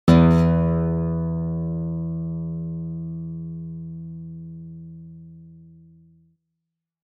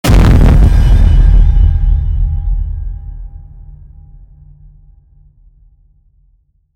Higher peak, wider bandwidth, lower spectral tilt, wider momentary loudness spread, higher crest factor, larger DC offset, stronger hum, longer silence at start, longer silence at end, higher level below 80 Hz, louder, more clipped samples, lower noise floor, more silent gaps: second, -4 dBFS vs 0 dBFS; second, 7.2 kHz vs 10.5 kHz; first, -9 dB/octave vs -7 dB/octave; first, 23 LU vs 20 LU; first, 20 dB vs 10 dB; neither; neither; about the same, 0.05 s vs 0.05 s; second, 1.35 s vs 3.15 s; second, -40 dBFS vs -12 dBFS; second, -23 LUFS vs -11 LUFS; neither; first, -82 dBFS vs -53 dBFS; neither